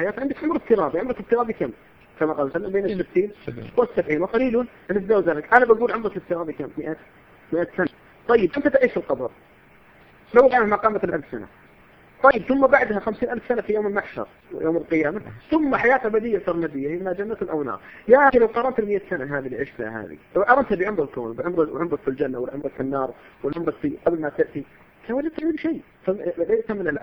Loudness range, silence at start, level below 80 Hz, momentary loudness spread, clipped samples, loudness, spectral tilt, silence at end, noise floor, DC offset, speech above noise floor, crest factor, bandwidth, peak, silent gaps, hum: 5 LU; 0 s; -52 dBFS; 13 LU; under 0.1%; -22 LUFS; -8.5 dB/octave; 0 s; -52 dBFS; under 0.1%; 30 dB; 22 dB; 6 kHz; 0 dBFS; none; none